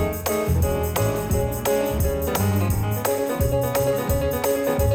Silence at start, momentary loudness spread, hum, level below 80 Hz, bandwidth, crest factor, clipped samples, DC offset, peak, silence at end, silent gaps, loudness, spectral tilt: 0 s; 2 LU; none; -32 dBFS; 19 kHz; 14 dB; under 0.1%; under 0.1%; -8 dBFS; 0 s; none; -23 LUFS; -5.5 dB/octave